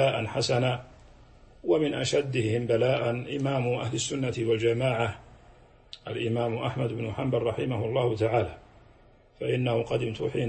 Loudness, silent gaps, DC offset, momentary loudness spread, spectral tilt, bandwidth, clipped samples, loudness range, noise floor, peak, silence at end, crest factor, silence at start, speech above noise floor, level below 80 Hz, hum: -28 LUFS; none; under 0.1%; 7 LU; -5.5 dB/octave; 8.8 kHz; under 0.1%; 3 LU; -57 dBFS; -12 dBFS; 0 s; 16 dB; 0 s; 30 dB; -56 dBFS; none